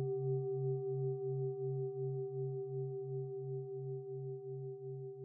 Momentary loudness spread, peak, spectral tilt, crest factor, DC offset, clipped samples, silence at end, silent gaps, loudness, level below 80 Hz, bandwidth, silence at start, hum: 8 LU; -28 dBFS; -8 dB/octave; 12 dB; under 0.1%; under 0.1%; 0 s; none; -41 LUFS; -90 dBFS; 1.2 kHz; 0 s; none